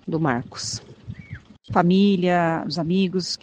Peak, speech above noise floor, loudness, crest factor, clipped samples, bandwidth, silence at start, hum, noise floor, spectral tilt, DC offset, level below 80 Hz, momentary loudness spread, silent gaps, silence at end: -2 dBFS; 20 dB; -21 LUFS; 20 dB; under 0.1%; 9.4 kHz; 0.05 s; none; -41 dBFS; -5.5 dB/octave; under 0.1%; -54 dBFS; 22 LU; none; 0.05 s